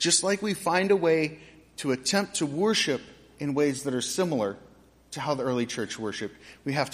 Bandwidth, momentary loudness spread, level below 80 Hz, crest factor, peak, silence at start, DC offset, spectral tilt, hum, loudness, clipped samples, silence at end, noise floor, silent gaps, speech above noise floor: 15.5 kHz; 13 LU; -64 dBFS; 20 dB; -8 dBFS; 0 s; under 0.1%; -3.5 dB/octave; none; -27 LUFS; under 0.1%; 0 s; -50 dBFS; none; 23 dB